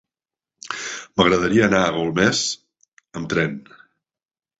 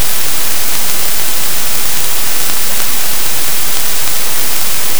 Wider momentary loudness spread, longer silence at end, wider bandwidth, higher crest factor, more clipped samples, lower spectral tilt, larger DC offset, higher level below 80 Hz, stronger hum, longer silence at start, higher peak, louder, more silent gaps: first, 17 LU vs 0 LU; first, 1 s vs 0 s; second, 8.2 kHz vs over 20 kHz; about the same, 20 dB vs 20 dB; neither; first, -4 dB/octave vs -0.5 dB/octave; second, under 0.1% vs 50%; second, -50 dBFS vs -42 dBFS; neither; first, 0.65 s vs 0 s; about the same, -2 dBFS vs 0 dBFS; second, -20 LUFS vs -13 LUFS; first, 2.88-2.97 s vs none